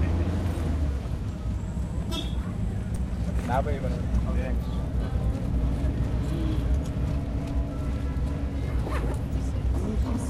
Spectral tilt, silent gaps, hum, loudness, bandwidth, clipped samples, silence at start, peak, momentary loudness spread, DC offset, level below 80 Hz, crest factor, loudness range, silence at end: -7.5 dB/octave; none; none; -29 LUFS; 12 kHz; under 0.1%; 0 s; -12 dBFS; 4 LU; under 0.1%; -30 dBFS; 16 dB; 2 LU; 0 s